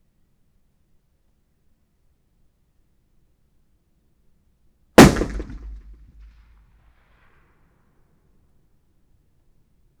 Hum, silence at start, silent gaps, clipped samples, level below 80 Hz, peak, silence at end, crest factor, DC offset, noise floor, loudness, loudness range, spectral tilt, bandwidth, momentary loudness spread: none; 5 s; none; under 0.1%; -38 dBFS; 0 dBFS; 4.3 s; 24 dB; under 0.1%; -64 dBFS; -14 LUFS; 4 LU; -5 dB/octave; over 20 kHz; 31 LU